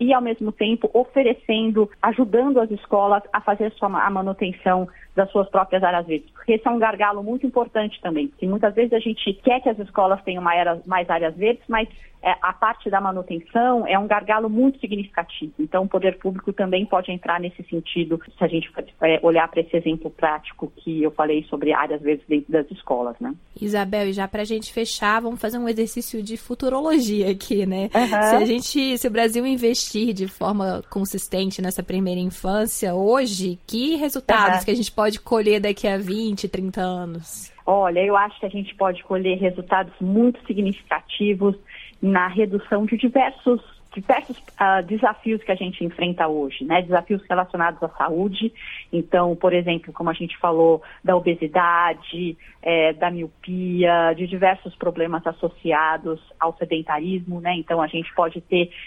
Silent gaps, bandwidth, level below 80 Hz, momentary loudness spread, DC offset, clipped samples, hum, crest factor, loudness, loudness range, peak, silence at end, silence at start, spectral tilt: none; 16.5 kHz; -50 dBFS; 8 LU; under 0.1%; under 0.1%; none; 20 dB; -21 LUFS; 3 LU; -2 dBFS; 0 s; 0 s; -5 dB/octave